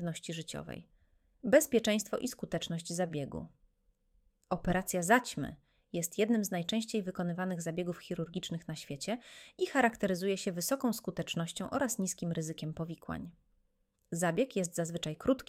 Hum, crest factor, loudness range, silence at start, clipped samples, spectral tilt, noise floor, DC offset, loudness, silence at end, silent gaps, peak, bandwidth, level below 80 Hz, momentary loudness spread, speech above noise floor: none; 24 dB; 4 LU; 0 s; under 0.1%; -4.5 dB/octave; -76 dBFS; under 0.1%; -34 LUFS; 0.05 s; none; -10 dBFS; 16.5 kHz; -60 dBFS; 13 LU; 42 dB